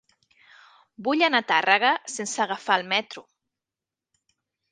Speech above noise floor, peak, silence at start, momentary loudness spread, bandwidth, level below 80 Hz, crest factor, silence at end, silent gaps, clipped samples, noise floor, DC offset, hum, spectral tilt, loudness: 66 dB; -2 dBFS; 1 s; 12 LU; 10 kHz; -82 dBFS; 24 dB; 1.5 s; none; under 0.1%; -89 dBFS; under 0.1%; none; -2 dB/octave; -23 LUFS